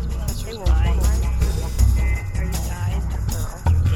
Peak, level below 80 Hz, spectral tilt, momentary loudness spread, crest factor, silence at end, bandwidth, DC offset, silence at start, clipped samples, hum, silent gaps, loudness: -4 dBFS; -20 dBFS; -5.5 dB/octave; 7 LU; 14 dB; 0 s; 16 kHz; under 0.1%; 0 s; under 0.1%; none; none; -22 LUFS